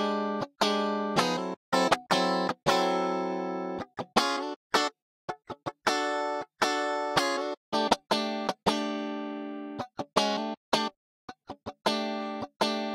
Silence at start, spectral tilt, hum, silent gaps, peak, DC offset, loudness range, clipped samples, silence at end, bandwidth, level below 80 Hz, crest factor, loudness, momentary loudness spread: 0 s; -3.5 dB/octave; none; 1.57-1.72 s, 4.56-4.70 s, 5.02-5.28 s, 7.57-7.72 s, 10.57-10.72 s, 10.96-11.28 s, 12.56-12.60 s; -6 dBFS; under 0.1%; 4 LU; under 0.1%; 0 s; 16 kHz; -66 dBFS; 24 dB; -29 LUFS; 12 LU